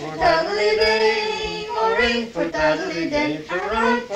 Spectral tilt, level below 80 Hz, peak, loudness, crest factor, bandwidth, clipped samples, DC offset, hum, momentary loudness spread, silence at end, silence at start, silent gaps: -4 dB/octave; -44 dBFS; -6 dBFS; -20 LUFS; 16 dB; 11 kHz; under 0.1%; under 0.1%; none; 7 LU; 0 s; 0 s; none